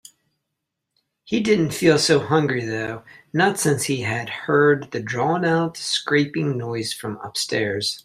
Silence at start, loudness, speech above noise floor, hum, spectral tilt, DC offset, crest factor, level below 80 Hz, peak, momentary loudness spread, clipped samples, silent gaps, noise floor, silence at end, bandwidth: 1.25 s; -21 LUFS; 59 dB; none; -4.5 dB/octave; under 0.1%; 18 dB; -60 dBFS; -4 dBFS; 10 LU; under 0.1%; none; -80 dBFS; 0.05 s; 15.5 kHz